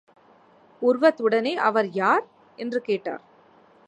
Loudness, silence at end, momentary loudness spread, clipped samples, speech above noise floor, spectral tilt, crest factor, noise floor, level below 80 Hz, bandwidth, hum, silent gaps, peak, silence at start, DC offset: -23 LUFS; 0.7 s; 13 LU; under 0.1%; 33 dB; -6 dB/octave; 20 dB; -56 dBFS; -82 dBFS; 9.2 kHz; none; none; -6 dBFS; 0.8 s; under 0.1%